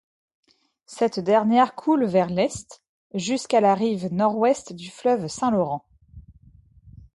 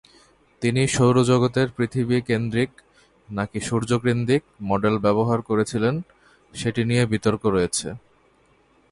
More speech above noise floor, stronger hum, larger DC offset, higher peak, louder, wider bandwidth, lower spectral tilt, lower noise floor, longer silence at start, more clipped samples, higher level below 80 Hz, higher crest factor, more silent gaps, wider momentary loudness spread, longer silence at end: second, 31 dB vs 38 dB; neither; neither; about the same, -6 dBFS vs -6 dBFS; about the same, -22 LUFS vs -22 LUFS; about the same, 11.5 kHz vs 11.5 kHz; about the same, -5.5 dB/octave vs -6 dB/octave; second, -53 dBFS vs -59 dBFS; first, 0.9 s vs 0.6 s; neither; second, -56 dBFS vs -50 dBFS; about the same, 16 dB vs 16 dB; first, 2.89-3.10 s vs none; about the same, 11 LU vs 10 LU; second, 0.25 s vs 0.95 s